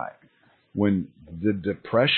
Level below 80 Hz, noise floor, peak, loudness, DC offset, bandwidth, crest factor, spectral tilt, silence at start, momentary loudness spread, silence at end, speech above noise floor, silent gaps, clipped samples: -58 dBFS; -51 dBFS; -8 dBFS; -26 LUFS; under 0.1%; 4.4 kHz; 18 dB; -10.5 dB/octave; 0 s; 13 LU; 0 s; 26 dB; none; under 0.1%